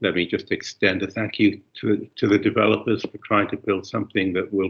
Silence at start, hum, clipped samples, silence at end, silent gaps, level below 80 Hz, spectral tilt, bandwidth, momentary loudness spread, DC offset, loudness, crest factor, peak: 0 s; none; under 0.1%; 0 s; none; -62 dBFS; -6 dB/octave; 7.2 kHz; 7 LU; under 0.1%; -22 LUFS; 18 dB; -4 dBFS